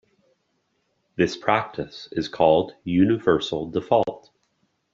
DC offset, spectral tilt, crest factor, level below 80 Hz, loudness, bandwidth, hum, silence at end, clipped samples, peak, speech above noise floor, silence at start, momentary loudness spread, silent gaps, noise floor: under 0.1%; -6.5 dB/octave; 20 dB; -58 dBFS; -23 LUFS; 7.6 kHz; none; 0.75 s; under 0.1%; -4 dBFS; 50 dB; 1.2 s; 12 LU; none; -71 dBFS